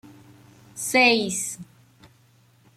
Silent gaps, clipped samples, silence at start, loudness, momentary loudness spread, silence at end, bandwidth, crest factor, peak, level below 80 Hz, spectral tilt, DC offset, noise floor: none; under 0.1%; 0.75 s; -21 LUFS; 22 LU; 1.1 s; 15.5 kHz; 20 dB; -6 dBFS; -68 dBFS; -2 dB/octave; under 0.1%; -58 dBFS